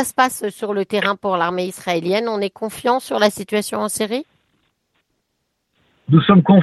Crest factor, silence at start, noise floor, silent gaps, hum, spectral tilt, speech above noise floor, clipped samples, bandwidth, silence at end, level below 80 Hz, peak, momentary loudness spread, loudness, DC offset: 18 dB; 0 s; -72 dBFS; none; none; -5.5 dB/octave; 55 dB; under 0.1%; 12.5 kHz; 0 s; -58 dBFS; 0 dBFS; 10 LU; -19 LUFS; under 0.1%